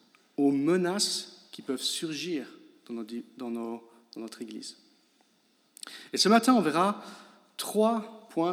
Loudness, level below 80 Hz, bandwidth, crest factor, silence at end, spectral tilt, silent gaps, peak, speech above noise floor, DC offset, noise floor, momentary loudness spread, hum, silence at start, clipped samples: -28 LUFS; under -90 dBFS; 16.5 kHz; 20 dB; 0 s; -4 dB/octave; none; -10 dBFS; 40 dB; under 0.1%; -68 dBFS; 21 LU; none; 0.4 s; under 0.1%